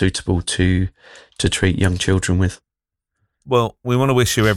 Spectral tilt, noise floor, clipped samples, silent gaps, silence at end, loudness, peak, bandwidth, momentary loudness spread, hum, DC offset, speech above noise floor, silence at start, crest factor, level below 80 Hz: -5 dB/octave; -83 dBFS; under 0.1%; none; 0 s; -19 LUFS; -4 dBFS; 15.5 kHz; 6 LU; none; under 0.1%; 66 dB; 0 s; 14 dB; -38 dBFS